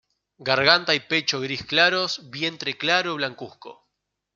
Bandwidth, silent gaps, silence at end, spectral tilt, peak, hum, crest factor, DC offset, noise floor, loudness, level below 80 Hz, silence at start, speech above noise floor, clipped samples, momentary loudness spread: 12.5 kHz; none; 0.65 s; -3 dB/octave; -2 dBFS; none; 24 dB; under 0.1%; -79 dBFS; -21 LUFS; -66 dBFS; 0.4 s; 56 dB; under 0.1%; 12 LU